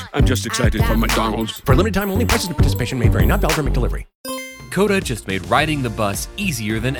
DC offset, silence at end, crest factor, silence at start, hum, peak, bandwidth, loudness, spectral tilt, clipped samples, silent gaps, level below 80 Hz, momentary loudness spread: under 0.1%; 0 s; 18 dB; 0 s; none; 0 dBFS; 19.5 kHz; -19 LUFS; -5 dB/octave; under 0.1%; 4.15-4.24 s; -24 dBFS; 8 LU